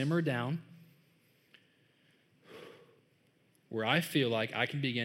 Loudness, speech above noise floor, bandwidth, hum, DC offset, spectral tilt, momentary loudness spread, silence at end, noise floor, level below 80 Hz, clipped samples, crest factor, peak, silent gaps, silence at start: -33 LUFS; 38 dB; 16 kHz; none; under 0.1%; -5.5 dB/octave; 23 LU; 0 s; -70 dBFS; -90 dBFS; under 0.1%; 20 dB; -16 dBFS; none; 0 s